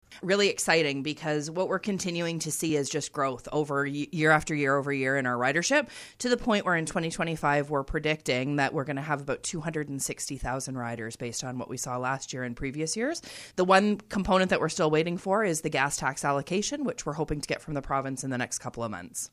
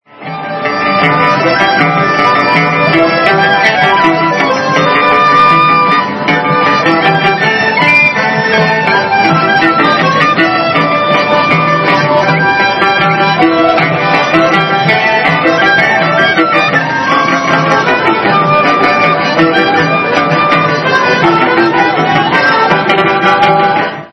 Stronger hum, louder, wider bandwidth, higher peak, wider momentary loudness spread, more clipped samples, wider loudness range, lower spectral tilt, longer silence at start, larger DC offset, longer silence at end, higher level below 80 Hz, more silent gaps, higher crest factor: neither; second, -28 LUFS vs -8 LUFS; first, 15.5 kHz vs 11 kHz; second, -6 dBFS vs 0 dBFS; first, 10 LU vs 3 LU; second, under 0.1% vs 0.4%; first, 6 LU vs 1 LU; second, -4 dB/octave vs -5.5 dB/octave; about the same, 0.1 s vs 0.2 s; neither; about the same, 0.05 s vs 0.05 s; about the same, -52 dBFS vs -48 dBFS; neither; first, 22 dB vs 8 dB